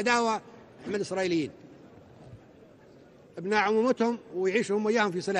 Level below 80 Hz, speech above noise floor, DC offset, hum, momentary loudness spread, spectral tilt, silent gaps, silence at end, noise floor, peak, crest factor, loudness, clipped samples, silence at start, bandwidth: -68 dBFS; 27 dB; under 0.1%; none; 12 LU; -4.5 dB/octave; none; 0 s; -54 dBFS; -12 dBFS; 18 dB; -28 LUFS; under 0.1%; 0 s; 10.5 kHz